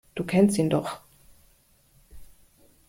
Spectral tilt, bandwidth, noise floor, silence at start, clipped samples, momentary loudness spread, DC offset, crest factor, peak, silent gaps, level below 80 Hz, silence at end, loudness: -6.5 dB/octave; 16.5 kHz; -61 dBFS; 0.15 s; under 0.1%; 16 LU; under 0.1%; 20 dB; -8 dBFS; none; -56 dBFS; 0.65 s; -24 LUFS